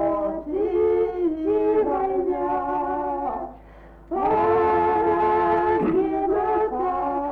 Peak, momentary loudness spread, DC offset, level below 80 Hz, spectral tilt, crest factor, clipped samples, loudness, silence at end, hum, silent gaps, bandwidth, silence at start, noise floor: -12 dBFS; 7 LU; under 0.1%; -48 dBFS; -9 dB/octave; 10 dB; under 0.1%; -22 LUFS; 0 s; none; none; 4.8 kHz; 0 s; -45 dBFS